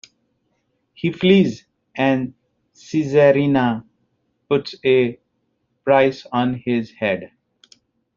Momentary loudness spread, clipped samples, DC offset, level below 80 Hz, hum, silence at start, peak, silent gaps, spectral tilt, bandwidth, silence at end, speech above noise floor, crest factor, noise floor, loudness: 12 LU; under 0.1%; under 0.1%; -60 dBFS; none; 1.05 s; -2 dBFS; none; -5 dB/octave; 7.4 kHz; 0.9 s; 52 dB; 18 dB; -70 dBFS; -19 LUFS